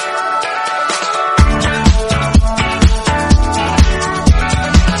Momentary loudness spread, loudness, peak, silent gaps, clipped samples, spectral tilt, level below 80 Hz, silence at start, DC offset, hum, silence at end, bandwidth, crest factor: 4 LU; -13 LUFS; 0 dBFS; none; 0.2%; -5 dB/octave; -14 dBFS; 0 s; under 0.1%; none; 0 s; 11.5 kHz; 12 dB